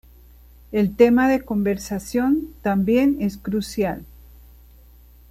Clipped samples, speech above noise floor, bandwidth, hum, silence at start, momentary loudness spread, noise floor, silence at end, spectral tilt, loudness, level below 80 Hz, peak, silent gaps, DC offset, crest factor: under 0.1%; 28 dB; 14.5 kHz; 60 Hz at -40 dBFS; 0.7 s; 10 LU; -48 dBFS; 1.25 s; -6.5 dB/octave; -21 LUFS; -44 dBFS; -2 dBFS; none; under 0.1%; 20 dB